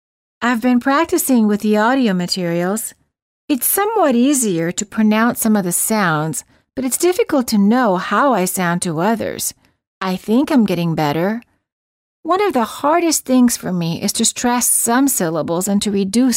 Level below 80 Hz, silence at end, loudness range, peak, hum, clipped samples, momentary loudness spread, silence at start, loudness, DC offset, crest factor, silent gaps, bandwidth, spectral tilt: -54 dBFS; 0 s; 3 LU; -2 dBFS; none; under 0.1%; 8 LU; 0.4 s; -16 LUFS; under 0.1%; 14 dB; 3.22-3.48 s, 9.87-10.01 s, 11.72-12.23 s; 16.5 kHz; -4 dB/octave